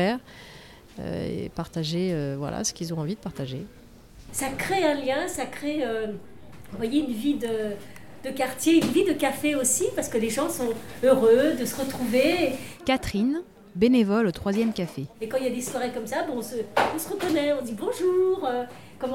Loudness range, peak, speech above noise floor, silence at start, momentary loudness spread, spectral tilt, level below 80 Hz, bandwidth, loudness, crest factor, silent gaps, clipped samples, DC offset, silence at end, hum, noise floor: 7 LU; -8 dBFS; 22 dB; 0 s; 14 LU; -4.5 dB/octave; -52 dBFS; 17 kHz; -26 LUFS; 18 dB; none; under 0.1%; 0.3%; 0 s; none; -47 dBFS